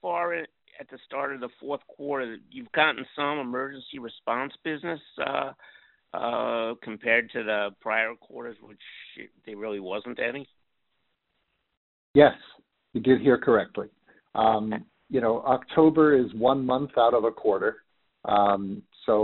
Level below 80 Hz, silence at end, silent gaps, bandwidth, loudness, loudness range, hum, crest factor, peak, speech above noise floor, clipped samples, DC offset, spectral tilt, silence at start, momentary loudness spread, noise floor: -62 dBFS; 0 s; 11.77-12.14 s; 4.2 kHz; -26 LUFS; 9 LU; none; 24 dB; -2 dBFS; 52 dB; under 0.1%; under 0.1%; -3.5 dB/octave; 0.05 s; 19 LU; -78 dBFS